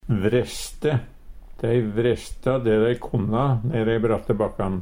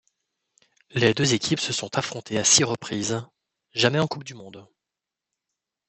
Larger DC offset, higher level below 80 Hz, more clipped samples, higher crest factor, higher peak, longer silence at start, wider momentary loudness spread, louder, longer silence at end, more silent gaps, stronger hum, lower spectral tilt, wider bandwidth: neither; first, -40 dBFS vs -64 dBFS; neither; second, 16 dB vs 24 dB; second, -6 dBFS vs -2 dBFS; second, 0.05 s vs 0.95 s; second, 5 LU vs 14 LU; about the same, -23 LUFS vs -23 LUFS; second, 0 s vs 1.25 s; neither; neither; first, -7 dB/octave vs -3 dB/octave; first, 16 kHz vs 8.6 kHz